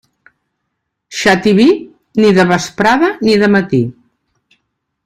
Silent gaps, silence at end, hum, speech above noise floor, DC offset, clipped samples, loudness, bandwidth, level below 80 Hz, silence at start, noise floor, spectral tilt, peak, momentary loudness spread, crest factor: none; 1.15 s; none; 62 dB; under 0.1%; under 0.1%; -12 LUFS; 13.5 kHz; -48 dBFS; 1.1 s; -72 dBFS; -5.5 dB/octave; 0 dBFS; 9 LU; 14 dB